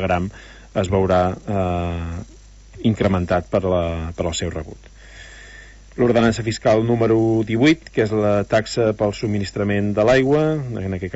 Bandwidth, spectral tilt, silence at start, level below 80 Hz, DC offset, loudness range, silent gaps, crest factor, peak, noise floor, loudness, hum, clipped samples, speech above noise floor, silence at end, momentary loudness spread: 8 kHz; -6.5 dB/octave; 0 s; -40 dBFS; under 0.1%; 5 LU; none; 16 dB; -4 dBFS; -42 dBFS; -19 LUFS; none; under 0.1%; 23 dB; 0 s; 12 LU